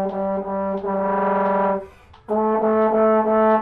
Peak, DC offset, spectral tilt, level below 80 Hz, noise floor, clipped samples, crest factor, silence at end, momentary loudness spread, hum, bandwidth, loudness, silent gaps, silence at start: -8 dBFS; under 0.1%; -10 dB/octave; -52 dBFS; -40 dBFS; under 0.1%; 12 dB; 0 s; 8 LU; none; 4.4 kHz; -20 LUFS; none; 0 s